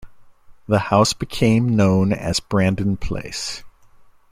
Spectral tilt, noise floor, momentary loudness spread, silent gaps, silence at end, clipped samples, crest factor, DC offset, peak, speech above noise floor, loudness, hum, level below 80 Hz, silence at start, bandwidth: -5.5 dB/octave; -48 dBFS; 11 LU; none; 0.65 s; under 0.1%; 18 dB; under 0.1%; -2 dBFS; 29 dB; -19 LUFS; none; -40 dBFS; 0 s; 15 kHz